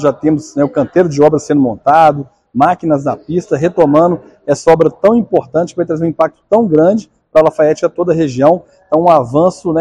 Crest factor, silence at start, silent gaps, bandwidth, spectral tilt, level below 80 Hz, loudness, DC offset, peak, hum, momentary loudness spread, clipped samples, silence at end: 12 dB; 0 s; none; 10.5 kHz; -7.5 dB/octave; -48 dBFS; -12 LUFS; under 0.1%; 0 dBFS; none; 7 LU; 0.9%; 0 s